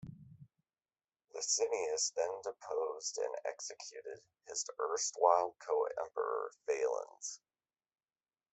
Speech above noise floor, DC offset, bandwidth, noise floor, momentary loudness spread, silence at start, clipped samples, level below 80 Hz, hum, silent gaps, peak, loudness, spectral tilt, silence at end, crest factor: over 53 dB; under 0.1%; 8.4 kHz; under -90 dBFS; 15 LU; 0 s; under 0.1%; -82 dBFS; none; none; -14 dBFS; -37 LUFS; -1 dB/octave; 1.15 s; 26 dB